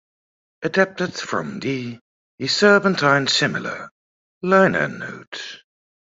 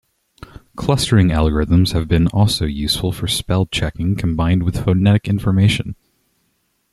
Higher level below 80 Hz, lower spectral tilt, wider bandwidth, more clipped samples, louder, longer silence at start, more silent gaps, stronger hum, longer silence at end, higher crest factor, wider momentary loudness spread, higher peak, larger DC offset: second, -62 dBFS vs -32 dBFS; second, -4.5 dB/octave vs -6 dB/octave; second, 8 kHz vs 13 kHz; neither; about the same, -19 LUFS vs -17 LUFS; second, 0.6 s vs 0.75 s; first, 2.01-2.38 s, 3.91-4.41 s, 5.27-5.32 s vs none; neither; second, 0.6 s vs 1 s; first, 20 dB vs 14 dB; first, 18 LU vs 6 LU; about the same, -2 dBFS vs -2 dBFS; neither